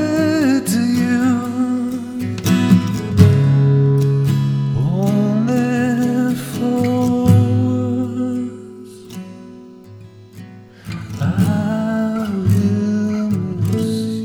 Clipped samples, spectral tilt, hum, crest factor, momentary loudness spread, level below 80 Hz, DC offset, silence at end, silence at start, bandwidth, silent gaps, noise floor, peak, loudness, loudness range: under 0.1%; -7.5 dB/octave; none; 16 dB; 15 LU; -46 dBFS; under 0.1%; 0 s; 0 s; 17.5 kHz; none; -39 dBFS; 0 dBFS; -17 LUFS; 9 LU